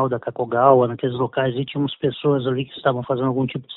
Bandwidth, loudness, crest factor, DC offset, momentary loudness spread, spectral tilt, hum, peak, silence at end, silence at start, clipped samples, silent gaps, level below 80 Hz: 4.1 kHz; -21 LUFS; 20 dB; under 0.1%; 9 LU; -11.5 dB/octave; none; 0 dBFS; 0 s; 0 s; under 0.1%; none; -60 dBFS